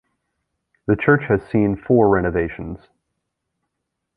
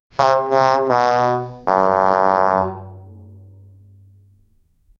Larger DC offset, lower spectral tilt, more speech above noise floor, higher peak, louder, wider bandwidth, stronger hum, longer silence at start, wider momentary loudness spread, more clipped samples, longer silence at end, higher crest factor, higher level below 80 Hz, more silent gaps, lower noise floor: neither; first, -10.5 dB/octave vs -6 dB/octave; first, 60 dB vs 41 dB; about the same, -2 dBFS vs 0 dBFS; about the same, -18 LUFS vs -16 LUFS; second, 4.7 kHz vs 7.4 kHz; neither; first, 0.9 s vs 0.2 s; first, 17 LU vs 8 LU; neither; second, 1.4 s vs 1.75 s; about the same, 20 dB vs 18 dB; first, -42 dBFS vs -56 dBFS; neither; first, -78 dBFS vs -57 dBFS